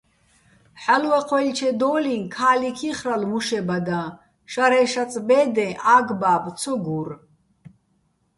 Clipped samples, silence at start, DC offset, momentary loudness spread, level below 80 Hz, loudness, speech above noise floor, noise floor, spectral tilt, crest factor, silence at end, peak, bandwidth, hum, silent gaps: under 0.1%; 0.75 s; under 0.1%; 11 LU; -64 dBFS; -21 LUFS; 46 dB; -67 dBFS; -4.5 dB/octave; 18 dB; 0.7 s; -4 dBFS; 11.5 kHz; none; none